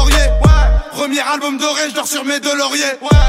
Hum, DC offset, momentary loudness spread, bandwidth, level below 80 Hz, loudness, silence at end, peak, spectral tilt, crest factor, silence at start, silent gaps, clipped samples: none; under 0.1%; 6 LU; 16 kHz; -16 dBFS; -14 LUFS; 0 s; 0 dBFS; -4 dB/octave; 12 dB; 0 s; none; under 0.1%